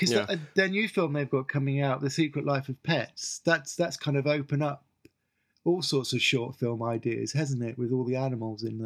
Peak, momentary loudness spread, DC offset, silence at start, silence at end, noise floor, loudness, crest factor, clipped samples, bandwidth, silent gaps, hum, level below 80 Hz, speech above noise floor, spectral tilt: -8 dBFS; 6 LU; under 0.1%; 0 s; 0 s; -75 dBFS; -29 LUFS; 20 dB; under 0.1%; 14 kHz; none; none; -76 dBFS; 47 dB; -5 dB/octave